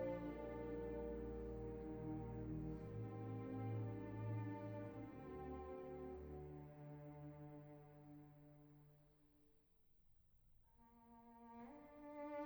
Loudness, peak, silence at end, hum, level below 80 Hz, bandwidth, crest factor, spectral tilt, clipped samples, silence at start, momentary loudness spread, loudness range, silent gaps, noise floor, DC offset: -52 LUFS; -36 dBFS; 0 s; none; -64 dBFS; over 20 kHz; 16 dB; -10 dB/octave; under 0.1%; 0 s; 15 LU; 17 LU; none; -74 dBFS; under 0.1%